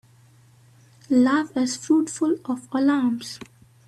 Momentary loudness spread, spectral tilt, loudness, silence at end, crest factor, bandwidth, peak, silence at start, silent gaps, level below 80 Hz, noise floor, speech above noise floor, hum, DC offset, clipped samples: 10 LU; -4 dB/octave; -22 LUFS; 0.45 s; 14 dB; 12.5 kHz; -8 dBFS; 1.1 s; none; -68 dBFS; -54 dBFS; 32 dB; none; under 0.1%; under 0.1%